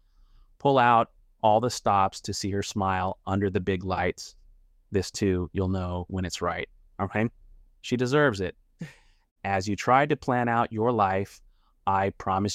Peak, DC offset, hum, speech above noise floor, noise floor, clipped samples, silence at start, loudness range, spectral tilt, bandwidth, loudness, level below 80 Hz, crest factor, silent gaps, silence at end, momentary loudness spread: -8 dBFS; under 0.1%; none; 31 dB; -57 dBFS; under 0.1%; 0.65 s; 5 LU; -5.5 dB/octave; 15 kHz; -26 LUFS; -54 dBFS; 20 dB; 9.31-9.36 s; 0 s; 13 LU